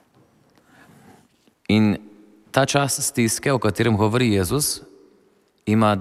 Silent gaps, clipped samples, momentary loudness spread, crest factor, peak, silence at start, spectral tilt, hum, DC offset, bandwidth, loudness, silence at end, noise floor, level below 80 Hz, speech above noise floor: none; under 0.1%; 8 LU; 18 dB; -4 dBFS; 1.7 s; -4.5 dB/octave; none; under 0.1%; 15.5 kHz; -20 LUFS; 0 s; -60 dBFS; -52 dBFS; 41 dB